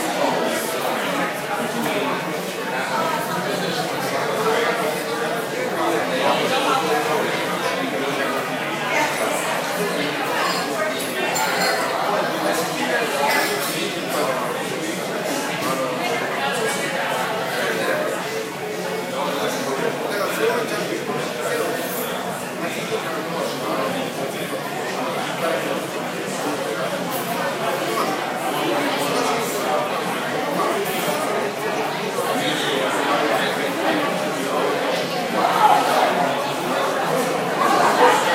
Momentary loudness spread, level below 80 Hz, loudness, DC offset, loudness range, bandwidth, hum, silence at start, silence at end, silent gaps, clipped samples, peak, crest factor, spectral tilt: 6 LU; -66 dBFS; -21 LUFS; under 0.1%; 5 LU; 16 kHz; none; 0 s; 0 s; none; under 0.1%; 0 dBFS; 20 dB; -3 dB/octave